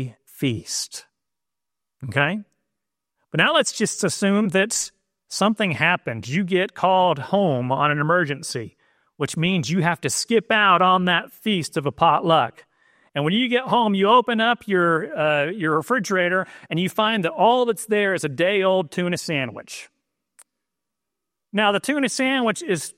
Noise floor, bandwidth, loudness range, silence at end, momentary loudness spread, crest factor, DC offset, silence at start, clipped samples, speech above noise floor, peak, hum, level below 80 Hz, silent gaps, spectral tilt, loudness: -87 dBFS; 16 kHz; 5 LU; 0.05 s; 11 LU; 18 dB; under 0.1%; 0 s; under 0.1%; 66 dB; -2 dBFS; none; -64 dBFS; none; -4 dB/octave; -21 LUFS